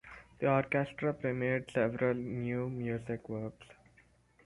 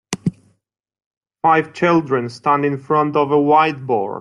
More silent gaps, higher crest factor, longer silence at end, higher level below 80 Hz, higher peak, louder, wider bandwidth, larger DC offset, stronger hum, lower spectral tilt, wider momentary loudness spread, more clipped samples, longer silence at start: second, none vs 1.06-1.11 s, 1.17-1.21 s; about the same, 18 dB vs 16 dB; first, 0.75 s vs 0 s; about the same, -64 dBFS vs -60 dBFS; second, -16 dBFS vs -2 dBFS; second, -34 LUFS vs -17 LUFS; about the same, 11.5 kHz vs 12 kHz; neither; neither; first, -8.5 dB/octave vs -6.5 dB/octave; about the same, 10 LU vs 8 LU; neither; about the same, 0.05 s vs 0.1 s